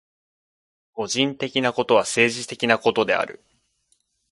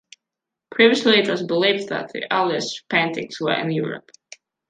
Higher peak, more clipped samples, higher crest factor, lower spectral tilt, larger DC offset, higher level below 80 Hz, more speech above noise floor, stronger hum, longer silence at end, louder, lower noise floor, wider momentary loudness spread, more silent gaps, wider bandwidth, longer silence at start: about the same, -2 dBFS vs -2 dBFS; neither; about the same, 22 dB vs 20 dB; second, -3 dB/octave vs -4.5 dB/octave; neither; about the same, -66 dBFS vs -70 dBFS; second, 47 dB vs 65 dB; neither; first, 1 s vs 0.7 s; about the same, -21 LUFS vs -20 LUFS; second, -68 dBFS vs -85 dBFS; about the same, 9 LU vs 11 LU; neither; first, 11.5 kHz vs 9.4 kHz; first, 0.95 s vs 0.7 s